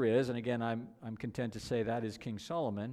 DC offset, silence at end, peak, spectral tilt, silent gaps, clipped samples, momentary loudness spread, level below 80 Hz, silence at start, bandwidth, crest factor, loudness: under 0.1%; 0 s; -18 dBFS; -6.5 dB/octave; none; under 0.1%; 9 LU; -64 dBFS; 0 s; 13.5 kHz; 16 dB; -37 LUFS